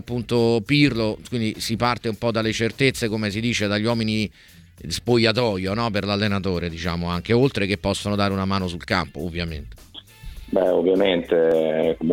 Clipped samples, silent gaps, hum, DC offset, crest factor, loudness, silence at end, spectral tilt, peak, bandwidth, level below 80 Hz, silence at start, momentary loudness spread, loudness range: under 0.1%; none; none; under 0.1%; 18 dB; -22 LUFS; 0 s; -5.5 dB/octave; -4 dBFS; 17 kHz; -44 dBFS; 0.05 s; 10 LU; 2 LU